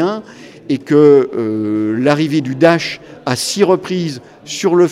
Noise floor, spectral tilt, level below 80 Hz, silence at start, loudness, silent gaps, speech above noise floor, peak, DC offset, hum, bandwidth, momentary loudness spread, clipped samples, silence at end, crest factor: -33 dBFS; -5.5 dB/octave; -58 dBFS; 0 s; -14 LUFS; none; 20 dB; 0 dBFS; under 0.1%; none; 14.5 kHz; 14 LU; under 0.1%; 0 s; 14 dB